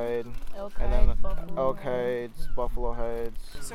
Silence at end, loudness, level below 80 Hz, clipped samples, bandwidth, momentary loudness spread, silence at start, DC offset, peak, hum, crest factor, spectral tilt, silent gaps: 0 s; -32 LUFS; -28 dBFS; under 0.1%; 11.5 kHz; 11 LU; 0 s; under 0.1%; -6 dBFS; none; 16 dB; -6.5 dB/octave; none